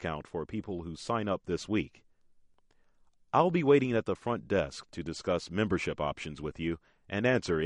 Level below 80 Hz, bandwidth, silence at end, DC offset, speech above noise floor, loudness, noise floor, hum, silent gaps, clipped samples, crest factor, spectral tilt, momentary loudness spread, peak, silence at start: -56 dBFS; 11 kHz; 0 s; under 0.1%; 34 dB; -32 LUFS; -65 dBFS; none; none; under 0.1%; 22 dB; -6 dB/octave; 13 LU; -10 dBFS; 0 s